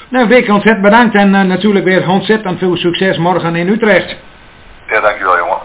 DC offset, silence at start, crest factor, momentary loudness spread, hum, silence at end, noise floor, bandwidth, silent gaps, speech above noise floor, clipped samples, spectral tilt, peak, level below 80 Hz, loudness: under 0.1%; 0 s; 10 dB; 6 LU; none; 0 s; -37 dBFS; 4 kHz; none; 27 dB; 0.7%; -10 dB/octave; 0 dBFS; -44 dBFS; -10 LUFS